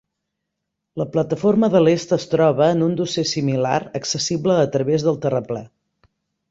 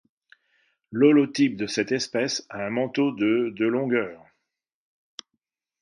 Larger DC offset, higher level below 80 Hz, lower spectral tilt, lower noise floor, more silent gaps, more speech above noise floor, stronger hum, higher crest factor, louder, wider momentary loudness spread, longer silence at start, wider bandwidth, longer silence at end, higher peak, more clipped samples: neither; first, -58 dBFS vs -70 dBFS; about the same, -5.5 dB/octave vs -5 dB/octave; about the same, -79 dBFS vs -82 dBFS; neither; about the same, 61 dB vs 59 dB; neither; about the same, 18 dB vs 20 dB; first, -19 LUFS vs -24 LUFS; second, 9 LU vs 18 LU; about the same, 0.95 s vs 0.9 s; second, 7.8 kHz vs 10.5 kHz; second, 0.85 s vs 1.65 s; first, -2 dBFS vs -6 dBFS; neither